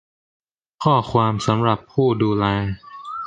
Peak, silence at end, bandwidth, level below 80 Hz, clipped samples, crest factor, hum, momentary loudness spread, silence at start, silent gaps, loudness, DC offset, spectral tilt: -2 dBFS; 0 s; 9.2 kHz; -46 dBFS; under 0.1%; 18 dB; none; 10 LU; 0.8 s; none; -20 LUFS; under 0.1%; -7 dB/octave